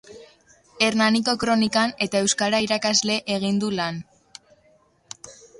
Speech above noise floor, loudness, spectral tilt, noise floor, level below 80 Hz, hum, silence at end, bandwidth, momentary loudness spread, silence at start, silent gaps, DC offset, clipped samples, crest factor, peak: 38 dB; -21 LUFS; -3 dB/octave; -60 dBFS; -60 dBFS; none; 0.25 s; 11.5 kHz; 18 LU; 0.1 s; none; under 0.1%; under 0.1%; 18 dB; -6 dBFS